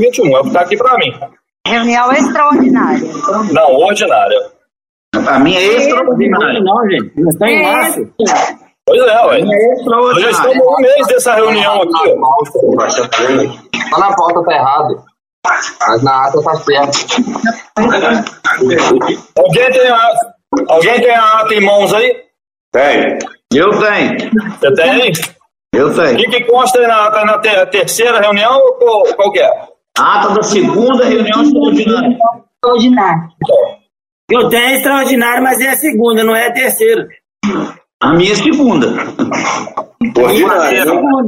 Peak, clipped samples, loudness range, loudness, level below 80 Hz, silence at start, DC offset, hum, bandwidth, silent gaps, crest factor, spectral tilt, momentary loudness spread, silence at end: 0 dBFS; under 0.1%; 3 LU; -10 LUFS; -50 dBFS; 0 s; under 0.1%; none; 16.5 kHz; 1.60-1.64 s, 4.89-5.12 s, 15.33-15.42 s, 22.60-22.72 s, 34.12-34.28 s, 37.94-38.00 s; 10 dB; -4 dB/octave; 8 LU; 0 s